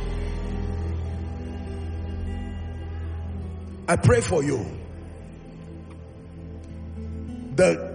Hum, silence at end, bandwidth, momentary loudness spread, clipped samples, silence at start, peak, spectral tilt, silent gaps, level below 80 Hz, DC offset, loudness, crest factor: none; 0 s; 10 kHz; 20 LU; under 0.1%; 0 s; -4 dBFS; -6.5 dB/octave; none; -38 dBFS; under 0.1%; -27 LUFS; 22 dB